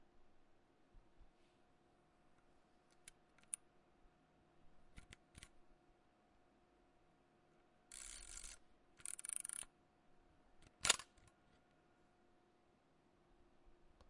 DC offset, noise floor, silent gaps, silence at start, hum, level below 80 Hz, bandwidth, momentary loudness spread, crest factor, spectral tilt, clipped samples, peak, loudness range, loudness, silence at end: under 0.1%; -75 dBFS; none; 0 s; none; -72 dBFS; 12 kHz; 27 LU; 40 dB; 0.5 dB/octave; under 0.1%; -14 dBFS; 23 LU; -44 LUFS; 0.05 s